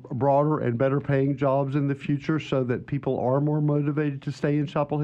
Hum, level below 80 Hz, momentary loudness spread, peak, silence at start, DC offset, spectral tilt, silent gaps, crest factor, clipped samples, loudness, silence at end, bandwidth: none; -60 dBFS; 5 LU; -10 dBFS; 0 s; under 0.1%; -9 dB/octave; none; 14 dB; under 0.1%; -25 LUFS; 0 s; 7.6 kHz